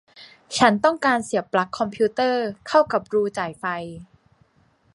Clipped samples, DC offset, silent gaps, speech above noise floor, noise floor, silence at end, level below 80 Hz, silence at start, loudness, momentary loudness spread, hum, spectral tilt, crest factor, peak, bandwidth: under 0.1%; under 0.1%; none; 40 dB; -61 dBFS; 0.9 s; -62 dBFS; 0.2 s; -22 LUFS; 10 LU; none; -4.5 dB/octave; 22 dB; -2 dBFS; 11.5 kHz